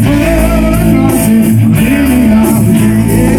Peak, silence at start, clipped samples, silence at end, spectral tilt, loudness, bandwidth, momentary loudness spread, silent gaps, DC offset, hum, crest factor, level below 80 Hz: 0 dBFS; 0 s; under 0.1%; 0 s; -6.5 dB/octave; -8 LUFS; 19.5 kHz; 2 LU; none; under 0.1%; none; 8 dB; -18 dBFS